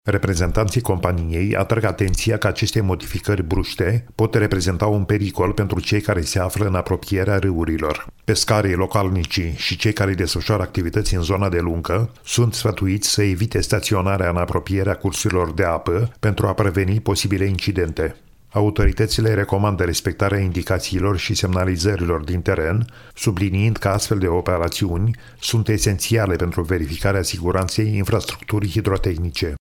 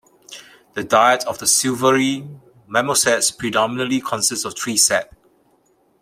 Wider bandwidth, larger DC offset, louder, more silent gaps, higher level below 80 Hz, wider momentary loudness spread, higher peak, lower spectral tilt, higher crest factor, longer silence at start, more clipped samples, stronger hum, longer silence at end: about the same, 17.5 kHz vs 16.5 kHz; first, 0.2% vs under 0.1%; second, -20 LUFS vs -17 LUFS; neither; first, -32 dBFS vs -60 dBFS; second, 4 LU vs 18 LU; about the same, -2 dBFS vs -2 dBFS; first, -5.5 dB/octave vs -2 dB/octave; about the same, 18 dB vs 18 dB; second, 0.05 s vs 0.3 s; neither; neither; second, 0.05 s vs 0.95 s